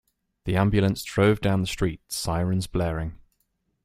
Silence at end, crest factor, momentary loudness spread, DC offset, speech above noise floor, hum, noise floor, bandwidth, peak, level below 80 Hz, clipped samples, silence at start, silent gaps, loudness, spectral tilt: 0.7 s; 20 dB; 9 LU; under 0.1%; 50 dB; none; -73 dBFS; 15.5 kHz; -4 dBFS; -42 dBFS; under 0.1%; 0.45 s; none; -25 LUFS; -6 dB/octave